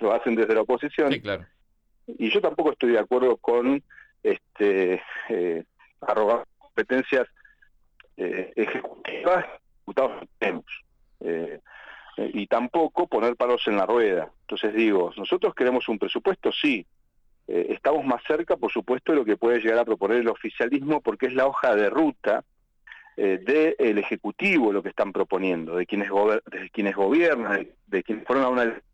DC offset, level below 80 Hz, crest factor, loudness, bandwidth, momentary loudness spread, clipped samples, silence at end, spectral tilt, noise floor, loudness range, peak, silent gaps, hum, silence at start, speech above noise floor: under 0.1%; -64 dBFS; 16 dB; -24 LUFS; 8.2 kHz; 10 LU; under 0.1%; 0.15 s; -6.5 dB/octave; -64 dBFS; 5 LU; -10 dBFS; none; none; 0 s; 41 dB